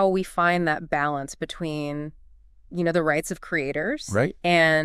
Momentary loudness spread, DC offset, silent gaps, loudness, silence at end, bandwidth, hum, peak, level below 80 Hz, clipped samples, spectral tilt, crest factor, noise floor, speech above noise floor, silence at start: 10 LU; under 0.1%; none; -24 LUFS; 0 s; 15 kHz; none; -8 dBFS; -50 dBFS; under 0.1%; -5 dB/octave; 16 dB; -52 dBFS; 28 dB; 0 s